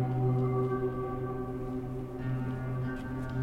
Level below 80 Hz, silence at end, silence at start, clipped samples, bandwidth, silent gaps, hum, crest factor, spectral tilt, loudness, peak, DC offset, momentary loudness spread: -48 dBFS; 0 s; 0 s; under 0.1%; 4.9 kHz; none; none; 14 dB; -10 dB/octave; -34 LUFS; -18 dBFS; under 0.1%; 8 LU